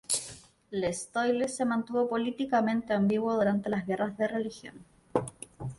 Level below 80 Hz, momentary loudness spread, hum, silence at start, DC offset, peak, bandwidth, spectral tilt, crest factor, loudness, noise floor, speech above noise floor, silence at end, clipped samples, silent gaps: -64 dBFS; 11 LU; none; 0.1 s; under 0.1%; -12 dBFS; 11.5 kHz; -5 dB/octave; 18 dB; -30 LUFS; -49 dBFS; 20 dB; 0.05 s; under 0.1%; none